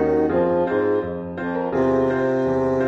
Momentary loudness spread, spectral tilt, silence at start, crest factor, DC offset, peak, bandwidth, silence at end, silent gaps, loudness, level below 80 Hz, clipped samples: 7 LU; -8.5 dB/octave; 0 s; 12 dB; under 0.1%; -8 dBFS; 7.4 kHz; 0 s; none; -21 LUFS; -46 dBFS; under 0.1%